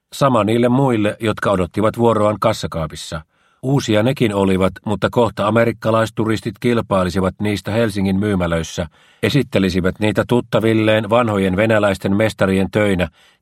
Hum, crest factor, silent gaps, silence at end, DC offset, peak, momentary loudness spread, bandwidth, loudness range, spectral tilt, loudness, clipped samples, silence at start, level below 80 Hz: none; 16 dB; none; 0.35 s; under 0.1%; 0 dBFS; 7 LU; 15.5 kHz; 2 LU; -6.5 dB/octave; -17 LUFS; under 0.1%; 0.15 s; -44 dBFS